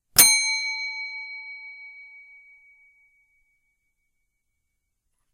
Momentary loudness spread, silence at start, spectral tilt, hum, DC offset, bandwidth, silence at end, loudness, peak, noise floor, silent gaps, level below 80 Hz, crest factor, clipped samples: 27 LU; 0.15 s; 2 dB/octave; none; under 0.1%; 16 kHz; 3.25 s; -19 LUFS; 0 dBFS; -77 dBFS; none; -58 dBFS; 28 dB; under 0.1%